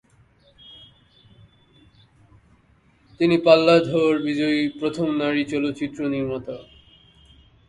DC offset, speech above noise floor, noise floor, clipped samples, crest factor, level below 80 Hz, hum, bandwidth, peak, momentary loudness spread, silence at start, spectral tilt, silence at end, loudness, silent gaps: under 0.1%; 38 dB; -58 dBFS; under 0.1%; 22 dB; -58 dBFS; none; 10.5 kHz; -2 dBFS; 13 LU; 0.7 s; -6.5 dB/octave; 1.05 s; -21 LUFS; none